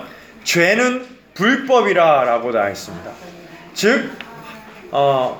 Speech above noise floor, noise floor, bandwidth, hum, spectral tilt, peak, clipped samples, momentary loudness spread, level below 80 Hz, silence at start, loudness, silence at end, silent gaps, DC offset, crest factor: 21 dB; -37 dBFS; over 20 kHz; none; -4 dB/octave; -2 dBFS; under 0.1%; 23 LU; -60 dBFS; 0 s; -16 LUFS; 0 s; none; under 0.1%; 16 dB